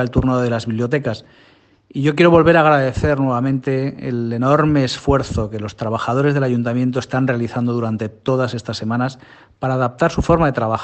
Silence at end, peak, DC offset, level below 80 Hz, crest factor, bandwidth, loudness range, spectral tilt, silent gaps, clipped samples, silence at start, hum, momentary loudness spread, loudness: 0 s; 0 dBFS; under 0.1%; -38 dBFS; 18 dB; 8.6 kHz; 5 LU; -7 dB/octave; none; under 0.1%; 0 s; none; 11 LU; -18 LUFS